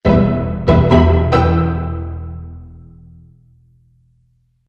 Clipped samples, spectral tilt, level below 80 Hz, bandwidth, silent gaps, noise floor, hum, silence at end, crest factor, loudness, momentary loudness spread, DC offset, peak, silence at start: under 0.1%; -9 dB/octave; -24 dBFS; 6.6 kHz; none; -58 dBFS; none; 1.9 s; 16 dB; -14 LUFS; 20 LU; under 0.1%; 0 dBFS; 0.05 s